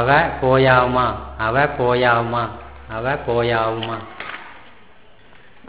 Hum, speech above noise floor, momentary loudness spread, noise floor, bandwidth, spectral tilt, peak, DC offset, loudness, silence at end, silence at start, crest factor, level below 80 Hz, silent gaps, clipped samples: none; 31 dB; 17 LU; -49 dBFS; 4 kHz; -9.5 dB/octave; 0 dBFS; 0.5%; -18 LUFS; 1.1 s; 0 s; 20 dB; -40 dBFS; none; under 0.1%